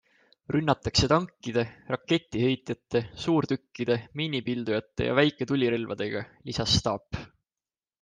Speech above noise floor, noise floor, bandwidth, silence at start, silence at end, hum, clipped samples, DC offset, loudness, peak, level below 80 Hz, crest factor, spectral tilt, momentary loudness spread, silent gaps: over 63 dB; under -90 dBFS; 9.8 kHz; 0.5 s; 0.75 s; none; under 0.1%; under 0.1%; -28 LUFS; -8 dBFS; -50 dBFS; 20 dB; -5 dB/octave; 8 LU; none